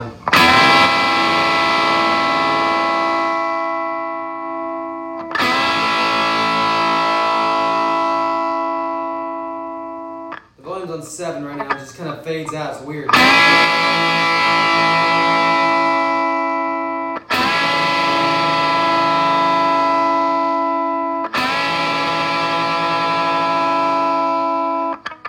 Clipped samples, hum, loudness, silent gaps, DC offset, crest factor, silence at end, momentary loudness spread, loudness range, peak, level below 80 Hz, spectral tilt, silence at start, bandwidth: under 0.1%; none; -16 LUFS; none; under 0.1%; 16 dB; 0 s; 14 LU; 9 LU; 0 dBFS; -56 dBFS; -3.5 dB/octave; 0 s; 16 kHz